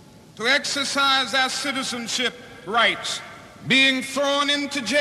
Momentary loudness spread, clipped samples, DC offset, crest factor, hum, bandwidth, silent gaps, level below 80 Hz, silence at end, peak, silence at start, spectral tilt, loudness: 11 LU; under 0.1%; under 0.1%; 16 dB; none; 14 kHz; none; -62 dBFS; 0 s; -8 dBFS; 0.35 s; -1.5 dB/octave; -21 LUFS